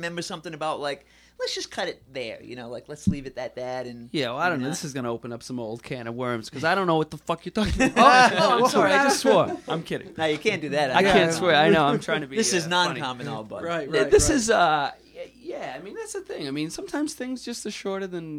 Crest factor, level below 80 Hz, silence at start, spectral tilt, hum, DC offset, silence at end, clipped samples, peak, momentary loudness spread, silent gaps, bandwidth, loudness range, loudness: 22 dB; -46 dBFS; 0 s; -4 dB/octave; none; under 0.1%; 0 s; under 0.1%; -2 dBFS; 16 LU; none; 16 kHz; 11 LU; -23 LUFS